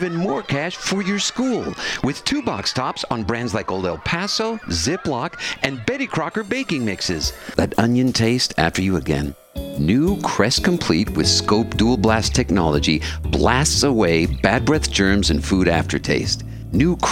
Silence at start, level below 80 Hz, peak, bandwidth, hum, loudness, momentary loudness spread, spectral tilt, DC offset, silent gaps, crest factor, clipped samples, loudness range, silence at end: 0 s; -34 dBFS; 0 dBFS; 16.5 kHz; none; -19 LUFS; 7 LU; -4.5 dB/octave; under 0.1%; none; 20 dB; under 0.1%; 5 LU; 0 s